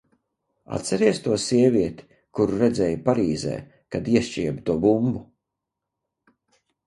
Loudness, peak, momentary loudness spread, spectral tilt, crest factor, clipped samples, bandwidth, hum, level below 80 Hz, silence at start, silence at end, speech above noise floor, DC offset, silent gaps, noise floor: -23 LUFS; -4 dBFS; 12 LU; -6 dB/octave; 20 dB; under 0.1%; 11.5 kHz; none; -52 dBFS; 0.7 s; 1.65 s; 62 dB; under 0.1%; none; -84 dBFS